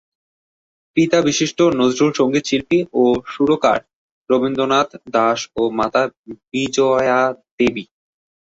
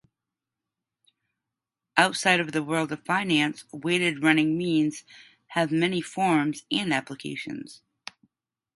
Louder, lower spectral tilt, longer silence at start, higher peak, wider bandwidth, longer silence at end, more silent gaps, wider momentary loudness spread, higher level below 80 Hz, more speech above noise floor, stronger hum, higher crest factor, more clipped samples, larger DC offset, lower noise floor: first, -17 LUFS vs -25 LUFS; about the same, -4.5 dB/octave vs -4.5 dB/octave; second, 0.95 s vs 1.95 s; about the same, -2 dBFS vs 0 dBFS; second, 8 kHz vs 11.5 kHz; second, 0.65 s vs 1 s; first, 3.93-4.25 s, 6.17-6.24 s, 7.51-7.58 s vs none; second, 6 LU vs 17 LU; first, -54 dBFS vs -70 dBFS; first, over 73 dB vs 62 dB; neither; second, 16 dB vs 28 dB; neither; neither; about the same, under -90 dBFS vs -88 dBFS